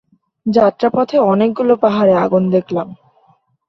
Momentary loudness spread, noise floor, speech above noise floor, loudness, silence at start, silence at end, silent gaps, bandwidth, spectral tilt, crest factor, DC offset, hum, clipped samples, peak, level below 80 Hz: 10 LU; -55 dBFS; 42 dB; -14 LUFS; 0.45 s; 0.75 s; none; 6.4 kHz; -8.5 dB/octave; 14 dB; under 0.1%; none; under 0.1%; -2 dBFS; -56 dBFS